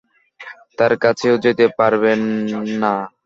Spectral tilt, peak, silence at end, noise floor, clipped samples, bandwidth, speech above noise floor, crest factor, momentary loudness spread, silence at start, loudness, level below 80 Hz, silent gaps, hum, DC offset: -6 dB/octave; -2 dBFS; 0.15 s; -39 dBFS; under 0.1%; 7.6 kHz; 23 dB; 16 dB; 12 LU; 0.4 s; -17 LUFS; -60 dBFS; none; none; under 0.1%